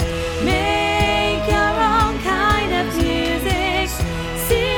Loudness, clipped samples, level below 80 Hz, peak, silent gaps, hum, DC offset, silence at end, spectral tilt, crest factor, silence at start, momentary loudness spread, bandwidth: -18 LUFS; under 0.1%; -28 dBFS; -4 dBFS; none; none; under 0.1%; 0 s; -4.5 dB/octave; 14 dB; 0 s; 5 LU; 19 kHz